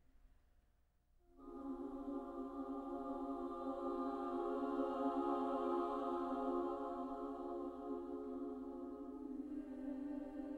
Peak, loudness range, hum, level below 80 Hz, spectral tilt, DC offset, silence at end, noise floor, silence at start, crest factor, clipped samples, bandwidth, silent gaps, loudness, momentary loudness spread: -28 dBFS; 7 LU; none; -68 dBFS; -7 dB/octave; under 0.1%; 0 s; -75 dBFS; 0.25 s; 16 dB; under 0.1%; 8.2 kHz; none; -44 LUFS; 9 LU